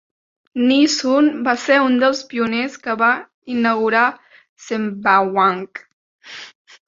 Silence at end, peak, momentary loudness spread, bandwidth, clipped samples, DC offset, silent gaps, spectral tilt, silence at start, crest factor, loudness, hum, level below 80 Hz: 0.4 s; -2 dBFS; 17 LU; 7.6 kHz; under 0.1%; under 0.1%; 3.34-3.42 s, 4.49-4.57 s, 5.93-6.19 s; -4 dB/octave; 0.55 s; 16 dB; -17 LUFS; none; -66 dBFS